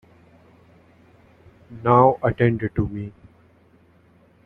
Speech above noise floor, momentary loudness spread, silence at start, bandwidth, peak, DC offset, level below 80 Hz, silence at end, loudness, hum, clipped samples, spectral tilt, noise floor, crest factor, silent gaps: 36 dB; 16 LU; 1.7 s; 4.1 kHz; -2 dBFS; under 0.1%; -48 dBFS; 1.35 s; -20 LUFS; none; under 0.1%; -10.5 dB/octave; -55 dBFS; 22 dB; none